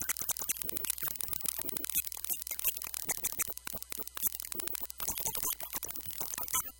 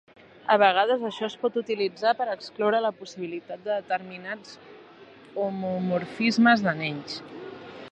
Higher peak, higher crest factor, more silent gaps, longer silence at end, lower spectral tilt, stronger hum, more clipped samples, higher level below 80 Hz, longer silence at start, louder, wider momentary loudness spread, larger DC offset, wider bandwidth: second, -10 dBFS vs -6 dBFS; about the same, 26 dB vs 22 dB; neither; about the same, 0 s vs 0 s; second, -0.5 dB/octave vs -5.5 dB/octave; neither; neither; first, -60 dBFS vs -74 dBFS; second, 0 s vs 0.45 s; second, -34 LUFS vs -25 LUFS; second, 4 LU vs 18 LU; neither; first, 17.5 kHz vs 8.6 kHz